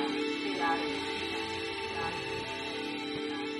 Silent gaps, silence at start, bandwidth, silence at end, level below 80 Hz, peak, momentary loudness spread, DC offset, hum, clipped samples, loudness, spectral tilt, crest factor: none; 0 s; 11.5 kHz; 0 s; -64 dBFS; -18 dBFS; 5 LU; under 0.1%; none; under 0.1%; -34 LUFS; -4 dB/octave; 16 dB